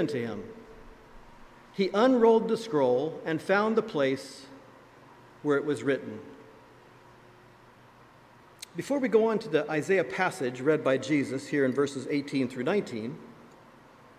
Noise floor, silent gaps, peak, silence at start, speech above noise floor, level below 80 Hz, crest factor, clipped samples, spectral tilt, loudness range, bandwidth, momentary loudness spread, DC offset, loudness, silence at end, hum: -55 dBFS; none; -10 dBFS; 0 s; 28 dB; -66 dBFS; 20 dB; under 0.1%; -6 dB/octave; 8 LU; 14.5 kHz; 18 LU; under 0.1%; -28 LUFS; 0.85 s; none